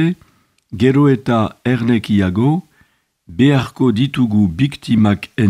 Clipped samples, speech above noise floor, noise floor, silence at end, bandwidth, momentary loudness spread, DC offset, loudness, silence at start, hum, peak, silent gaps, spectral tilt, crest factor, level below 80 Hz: under 0.1%; 43 dB; -57 dBFS; 0 s; 12 kHz; 6 LU; under 0.1%; -15 LUFS; 0 s; none; 0 dBFS; none; -8 dB/octave; 14 dB; -48 dBFS